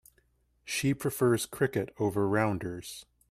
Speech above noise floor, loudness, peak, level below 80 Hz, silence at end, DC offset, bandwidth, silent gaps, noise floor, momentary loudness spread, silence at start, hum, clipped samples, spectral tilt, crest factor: 40 dB; -30 LUFS; -14 dBFS; -60 dBFS; 0.3 s; under 0.1%; 15.5 kHz; none; -70 dBFS; 15 LU; 0.65 s; none; under 0.1%; -5.5 dB/octave; 18 dB